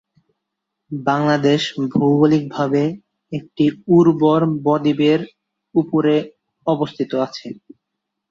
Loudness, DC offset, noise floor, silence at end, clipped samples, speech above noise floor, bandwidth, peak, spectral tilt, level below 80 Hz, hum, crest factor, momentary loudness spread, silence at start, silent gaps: -18 LUFS; under 0.1%; -79 dBFS; 0.75 s; under 0.1%; 62 dB; 7.6 kHz; -2 dBFS; -7.5 dB/octave; -60 dBFS; none; 16 dB; 16 LU; 0.9 s; none